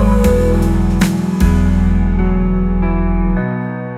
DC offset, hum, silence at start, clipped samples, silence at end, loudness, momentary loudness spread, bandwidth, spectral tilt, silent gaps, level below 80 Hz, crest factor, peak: under 0.1%; none; 0 s; under 0.1%; 0 s; -15 LUFS; 4 LU; 15 kHz; -7.5 dB/octave; none; -18 dBFS; 12 dB; 0 dBFS